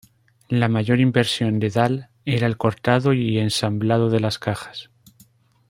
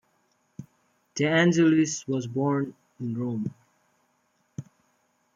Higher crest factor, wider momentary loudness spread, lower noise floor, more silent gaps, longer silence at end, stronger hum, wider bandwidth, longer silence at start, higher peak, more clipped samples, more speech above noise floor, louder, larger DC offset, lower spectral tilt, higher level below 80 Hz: about the same, 18 dB vs 18 dB; second, 8 LU vs 23 LU; second, -55 dBFS vs -70 dBFS; neither; about the same, 0.85 s vs 0.75 s; neither; first, 16 kHz vs 7.6 kHz; about the same, 0.5 s vs 0.6 s; first, -2 dBFS vs -10 dBFS; neither; second, 36 dB vs 46 dB; first, -21 LUFS vs -25 LUFS; neither; about the same, -6 dB/octave vs -5.5 dB/octave; first, -56 dBFS vs -72 dBFS